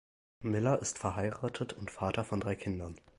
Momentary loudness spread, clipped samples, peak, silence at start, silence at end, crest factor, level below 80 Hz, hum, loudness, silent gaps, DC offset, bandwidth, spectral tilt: 9 LU; under 0.1%; -16 dBFS; 0.4 s; 0.2 s; 20 dB; -54 dBFS; none; -35 LUFS; none; under 0.1%; 11.5 kHz; -5.5 dB/octave